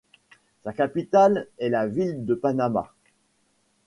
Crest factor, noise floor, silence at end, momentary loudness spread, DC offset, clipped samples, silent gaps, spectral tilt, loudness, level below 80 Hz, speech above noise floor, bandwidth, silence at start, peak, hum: 18 dB; -68 dBFS; 1 s; 14 LU; under 0.1%; under 0.1%; none; -7.5 dB/octave; -24 LUFS; -64 dBFS; 45 dB; 11 kHz; 0.65 s; -8 dBFS; none